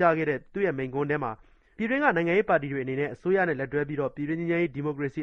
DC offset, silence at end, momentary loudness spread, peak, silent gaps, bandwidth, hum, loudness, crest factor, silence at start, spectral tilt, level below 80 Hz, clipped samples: under 0.1%; 0 s; 7 LU; -8 dBFS; none; 6.6 kHz; none; -27 LUFS; 20 dB; 0 s; -8.5 dB/octave; -58 dBFS; under 0.1%